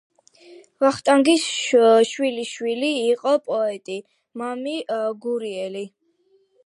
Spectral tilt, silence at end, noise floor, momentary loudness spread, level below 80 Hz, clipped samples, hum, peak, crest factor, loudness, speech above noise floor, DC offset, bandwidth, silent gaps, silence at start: -3 dB/octave; 0.8 s; -62 dBFS; 16 LU; -74 dBFS; under 0.1%; none; -4 dBFS; 18 dB; -21 LUFS; 42 dB; under 0.1%; 11.5 kHz; none; 0.5 s